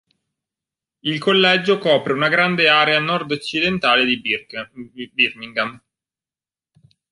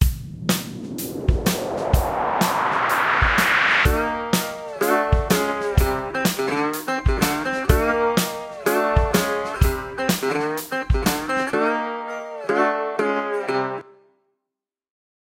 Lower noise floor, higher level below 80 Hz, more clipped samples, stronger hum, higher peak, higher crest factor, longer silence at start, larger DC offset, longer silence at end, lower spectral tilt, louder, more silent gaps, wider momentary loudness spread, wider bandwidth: first, under -90 dBFS vs -86 dBFS; second, -60 dBFS vs -30 dBFS; neither; neither; about the same, -2 dBFS vs 0 dBFS; about the same, 18 dB vs 22 dB; first, 1.05 s vs 0 s; neither; second, 1.35 s vs 1.6 s; about the same, -5 dB/octave vs -4.5 dB/octave; first, -17 LUFS vs -21 LUFS; neither; first, 13 LU vs 8 LU; second, 11.5 kHz vs 16 kHz